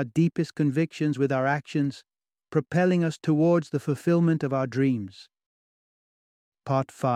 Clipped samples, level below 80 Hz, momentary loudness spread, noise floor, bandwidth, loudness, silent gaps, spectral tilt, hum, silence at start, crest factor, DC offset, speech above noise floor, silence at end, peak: under 0.1%; -68 dBFS; 7 LU; under -90 dBFS; 11 kHz; -25 LUFS; 5.46-6.52 s; -8 dB/octave; none; 0 s; 16 dB; under 0.1%; over 65 dB; 0 s; -10 dBFS